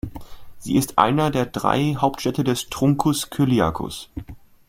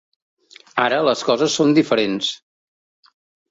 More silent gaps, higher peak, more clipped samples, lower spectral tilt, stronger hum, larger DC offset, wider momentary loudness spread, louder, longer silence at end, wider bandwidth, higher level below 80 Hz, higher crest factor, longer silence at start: neither; about the same, 0 dBFS vs -2 dBFS; neither; first, -5.5 dB/octave vs -4 dB/octave; neither; neither; first, 15 LU vs 10 LU; second, -21 LUFS vs -18 LUFS; second, 0.3 s vs 1.15 s; first, 16.5 kHz vs 8 kHz; first, -44 dBFS vs -64 dBFS; about the same, 22 dB vs 18 dB; second, 0.05 s vs 0.75 s